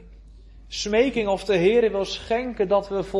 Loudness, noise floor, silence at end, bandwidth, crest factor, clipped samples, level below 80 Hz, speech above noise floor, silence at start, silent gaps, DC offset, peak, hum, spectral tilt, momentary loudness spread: -22 LUFS; -45 dBFS; 0 s; 11.5 kHz; 16 dB; under 0.1%; -46 dBFS; 24 dB; 0 s; none; under 0.1%; -8 dBFS; none; -4.5 dB/octave; 8 LU